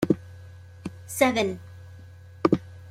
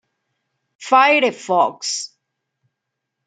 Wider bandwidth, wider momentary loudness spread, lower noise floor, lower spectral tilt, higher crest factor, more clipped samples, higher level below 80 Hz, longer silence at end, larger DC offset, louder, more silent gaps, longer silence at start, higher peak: first, 16.5 kHz vs 9.4 kHz; first, 24 LU vs 17 LU; second, -46 dBFS vs -79 dBFS; first, -5.5 dB/octave vs -2 dB/octave; first, 24 dB vs 18 dB; neither; first, -60 dBFS vs -78 dBFS; second, 0 s vs 1.2 s; neither; second, -26 LUFS vs -16 LUFS; neither; second, 0 s vs 0.8 s; about the same, -4 dBFS vs -2 dBFS